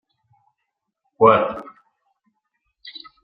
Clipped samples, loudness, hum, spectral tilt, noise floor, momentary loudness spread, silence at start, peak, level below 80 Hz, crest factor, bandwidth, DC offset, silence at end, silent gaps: under 0.1%; -17 LUFS; none; -8.5 dB/octave; -79 dBFS; 24 LU; 1.2 s; -2 dBFS; -62 dBFS; 22 dB; 5 kHz; under 0.1%; 0.35 s; none